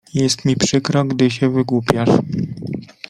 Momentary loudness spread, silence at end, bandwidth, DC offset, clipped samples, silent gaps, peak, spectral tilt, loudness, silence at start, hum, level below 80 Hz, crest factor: 9 LU; 0.25 s; 13 kHz; under 0.1%; under 0.1%; none; 0 dBFS; -5.5 dB/octave; -17 LUFS; 0.15 s; none; -50 dBFS; 18 dB